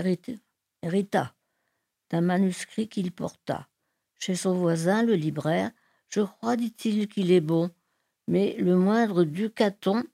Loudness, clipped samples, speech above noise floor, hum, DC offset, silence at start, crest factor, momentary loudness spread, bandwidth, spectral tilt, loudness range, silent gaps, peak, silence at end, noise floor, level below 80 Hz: -26 LUFS; under 0.1%; 53 dB; none; under 0.1%; 0 s; 16 dB; 12 LU; 14.5 kHz; -6.5 dB/octave; 5 LU; none; -10 dBFS; 0.05 s; -78 dBFS; -72 dBFS